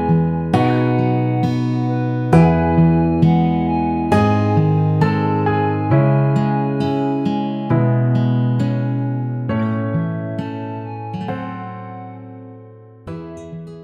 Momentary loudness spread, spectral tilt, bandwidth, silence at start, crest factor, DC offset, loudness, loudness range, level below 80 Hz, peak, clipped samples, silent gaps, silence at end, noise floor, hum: 17 LU; -9.5 dB/octave; 8.8 kHz; 0 s; 16 dB; under 0.1%; -17 LUFS; 10 LU; -40 dBFS; 0 dBFS; under 0.1%; none; 0 s; -40 dBFS; none